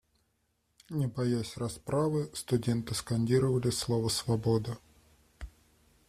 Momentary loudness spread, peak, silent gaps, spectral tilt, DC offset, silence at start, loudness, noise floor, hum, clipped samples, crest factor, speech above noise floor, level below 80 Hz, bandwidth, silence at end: 15 LU; -16 dBFS; none; -6 dB/octave; under 0.1%; 0.9 s; -31 LUFS; -76 dBFS; none; under 0.1%; 18 dB; 46 dB; -56 dBFS; 15 kHz; 0.6 s